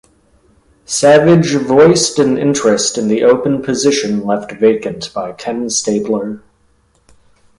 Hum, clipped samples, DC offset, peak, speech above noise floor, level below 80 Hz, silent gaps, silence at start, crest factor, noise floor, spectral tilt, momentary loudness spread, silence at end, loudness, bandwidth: none; under 0.1%; under 0.1%; 0 dBFS; 43 dB; -50 dBFS; none; 0.9 s; 14 dB; -55 dBFS; -4.5 dB/octave; 13 LU; 1.2 s; -13 LUFS; 11.5 kHz